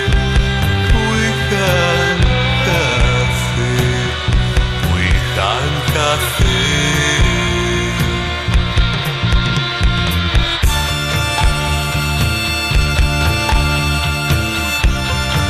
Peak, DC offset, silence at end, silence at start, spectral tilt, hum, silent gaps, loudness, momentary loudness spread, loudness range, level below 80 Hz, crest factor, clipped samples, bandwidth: 0 dBFS; under 0.1%; 0 s; 0 s; -4.5 dB/octave; none; none; -15 LUFS; 3 LU; 1 LU; -20 dBFS; 14 dB; under 0.1%; 14 kHz